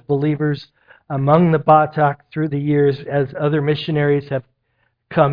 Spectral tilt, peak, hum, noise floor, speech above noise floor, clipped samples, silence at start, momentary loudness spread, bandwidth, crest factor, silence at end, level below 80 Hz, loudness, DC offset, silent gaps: -10.5 dB/octave; 0 dBFS; none; -66 dBFS; 50 dB; under 0.1%; 0.1 s; 11 LU; 5.2 kHz; 18 dB; 0 s; -52 dBFS; -18 LUFS; under 0.1%; none